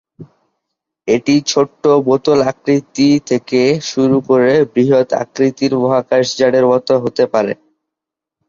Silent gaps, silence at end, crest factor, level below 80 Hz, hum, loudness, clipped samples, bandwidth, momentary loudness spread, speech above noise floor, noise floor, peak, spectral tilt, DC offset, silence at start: none; 0.95 s; 14 dB; -56 dBFS; none; -14 LUFS; under 0.1%; 7.6 kHz; 5 LU; 70 dB; -83 dBFS; 0 dBFS; -5.5 dB/octave; under 0.1%; 0.2 s